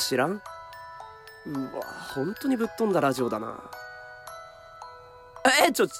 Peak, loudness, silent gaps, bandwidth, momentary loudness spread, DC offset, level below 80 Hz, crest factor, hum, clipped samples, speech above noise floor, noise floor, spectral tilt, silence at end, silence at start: -8 dBFS; -26 LUFS; none; 16 kHz; 23 LU; under 0.1%; -64 dBFS; 20 dB; none; under 0.1%; 21 dB; -47 dBFS; -3.5 dB/octave; 0 s; 0 s